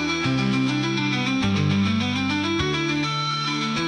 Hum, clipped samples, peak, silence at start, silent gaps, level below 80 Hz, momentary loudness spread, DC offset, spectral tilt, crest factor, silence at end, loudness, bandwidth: none; under 0.1%; -10 dBFS; 0 s; none; -50 dBFS; 2 LU; under 0.1%; -5 dB/octave; 12 dB; 0 s; -22 LUFS; 10 kHz